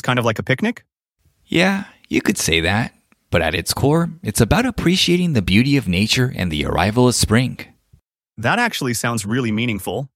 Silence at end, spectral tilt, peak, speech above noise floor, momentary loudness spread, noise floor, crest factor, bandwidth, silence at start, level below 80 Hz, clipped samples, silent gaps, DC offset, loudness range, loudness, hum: 0.1 s; -4.5 dB/octave; 0 dBFS; 45 dB; 7 LU; -63 dBFS; 18 dB; 16.5 kHz; 0.05 s; -38 dBFS; under 0.1%; none; under 0.1%; 3 LU; -18 LUFS; none